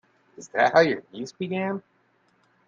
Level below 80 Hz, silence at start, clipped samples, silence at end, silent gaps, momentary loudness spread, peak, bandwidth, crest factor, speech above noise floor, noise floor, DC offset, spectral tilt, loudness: -70 dBFS; 0.4 s; under 0.1%; 0.85 s; none; 16 LU; -4 dBFS; 7.6 kHz; 22 dB; 41 dB; -65 dBFS; under 0.1%; -5.5 dB/octave; -24 LUFS